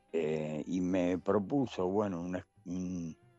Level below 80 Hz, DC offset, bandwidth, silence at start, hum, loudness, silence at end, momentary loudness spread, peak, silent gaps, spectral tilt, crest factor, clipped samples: -66 dBFS; under 0.1%; 8 kHz; 0.15 s; none; -35 LUFS; 0.25 s; 9 LU; -18 dBFS; none; -7.5 dB/octave; 16 dB; under 0.1%